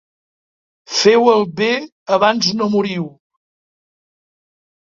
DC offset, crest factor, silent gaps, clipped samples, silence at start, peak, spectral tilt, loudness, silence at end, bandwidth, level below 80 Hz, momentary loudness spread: under 0.1%; 18 dB; 1.92-2.06 s; under 0.1%; 0.9 s; 0 dBFS; -4 dB/octave; -15 LUFS; 1.8 s; 7.6 kHz; -62 dBFS; 11 LU